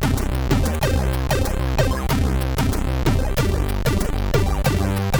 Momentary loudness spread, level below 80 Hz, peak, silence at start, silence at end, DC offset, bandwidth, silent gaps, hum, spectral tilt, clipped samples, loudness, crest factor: 2 LU; -22 dBFS; -6 dBFS; 0 s; 0 s; under 0.1%; over 20 kHz; none; none; -6 dB/octave; under 0.1%; -21 LUFS; 14 dB